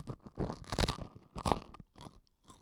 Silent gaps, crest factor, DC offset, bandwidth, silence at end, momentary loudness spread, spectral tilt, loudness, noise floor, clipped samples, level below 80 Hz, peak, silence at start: none; 30 dB; under 0.1%; 17.5 kHz; 0.05 s; 20 LU; -5 dB/octave; -38 LUFS; -62 dBFS; under 0.1%; -48 dBFS; -8 dBFS; 0 s